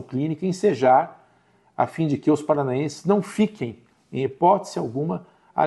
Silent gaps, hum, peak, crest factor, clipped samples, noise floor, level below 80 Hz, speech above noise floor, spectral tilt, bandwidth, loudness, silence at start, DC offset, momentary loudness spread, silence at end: none; none; -4 dBFS; 18 dB; under 0.1%; -60 dBFS; -66 dBFS; 38 dB; -7 dB/octave; 12 kHz; -23 LUFS; 0 s; under 0.1%; 14 LU; 0 s